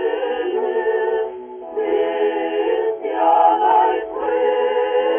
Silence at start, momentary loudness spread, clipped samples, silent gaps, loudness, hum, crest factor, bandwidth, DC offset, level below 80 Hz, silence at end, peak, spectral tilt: 0 s; 9 LU; under 0.1%; none; -19 LUFS; none; 14 dB; 3.5 kHz; under 0.1%; -60 dBFS; 0 s; -4 dBFS; -0.5 dB/octave